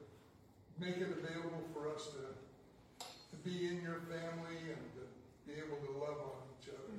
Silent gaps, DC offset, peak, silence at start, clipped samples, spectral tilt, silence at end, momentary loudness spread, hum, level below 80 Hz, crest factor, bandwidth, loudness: none; under 0.1%; -30 dBFS; 0 s; under 0.1%; -5.5 dB/octave; 0 s; 18 LU; none; -76 dBFS; 16 dB; 16 kHz; -46 LUFS